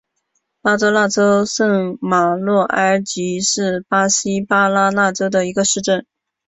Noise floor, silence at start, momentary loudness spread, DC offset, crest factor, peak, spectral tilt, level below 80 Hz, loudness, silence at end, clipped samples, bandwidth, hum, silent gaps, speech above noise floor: -70 dBFS; 0.65 s; 5 LU; under 0.1%; 14 dB; -2 dBFS; -3.5 dB/octave; -58 dBFS; -16 LUFS; 0.45 s; under 0.1%; 8.4 kHz; none; none; 54 dB